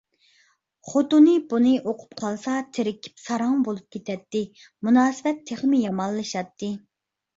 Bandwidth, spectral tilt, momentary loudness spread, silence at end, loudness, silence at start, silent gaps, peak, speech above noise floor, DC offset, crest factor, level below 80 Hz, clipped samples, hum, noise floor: 7.8 kHz; -5.5 dB/octave; 15 LU; 0.6 s; -23 LUFS; 0.85 s; none; -6 dBFS; 41 dB; under 0.1%; 18 dB; -68 dBFS; under 0.1%; none; -64 dBFS